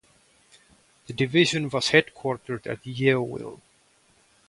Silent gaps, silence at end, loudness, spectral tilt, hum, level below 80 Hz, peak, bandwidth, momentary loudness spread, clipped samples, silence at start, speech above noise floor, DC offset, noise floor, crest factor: none; 0.95 s; -24 LUFS; -5 dB/octave; none; -62 dBFS; -4 dBFS; 11.5 kHz; 15 LU; under 0.1%; 1.1 s; 37 dB; under 0.1%; -62 dBFS; 24 dB